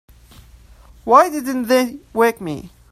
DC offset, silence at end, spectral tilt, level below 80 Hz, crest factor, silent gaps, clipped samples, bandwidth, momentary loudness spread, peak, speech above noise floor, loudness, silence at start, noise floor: under 0.1%; 0.25 s; -4.5 dB/octave; -48 dBFS; 18 dB; none; under 0.1%; 16 kHz; 17 LU; 0 dBFS; 29 dB; -17 LUFS; 1.05 s; -45 dBFS